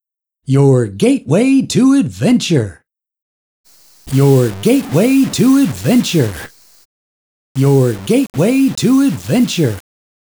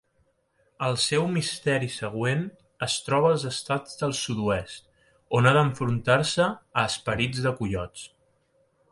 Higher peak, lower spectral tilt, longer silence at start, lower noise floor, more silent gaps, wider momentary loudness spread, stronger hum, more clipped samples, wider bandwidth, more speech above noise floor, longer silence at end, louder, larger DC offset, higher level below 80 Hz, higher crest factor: first, 0 dBFS vs -6 dBFS; first, -6.5 dB/octave vs -4.5 dB/octave; second, 0.5 s vs 0.8 s; first, under -90 dBFS vs -69 dBFS; first, 3.22-3.64 s, 6.85-7.55 s vs none; second, 6 LU vs 10 LU; neither; neither; first, over 20 kHz vs 11.5 kHz; first, over 78 dB vs 43 dB; second, 0.5 s vs 0.85 s; first, -13 LUFS vs -25 LUFS; neither; first, -48 dBFS vs -54 dBFS; second, 14 dB vs 20 dB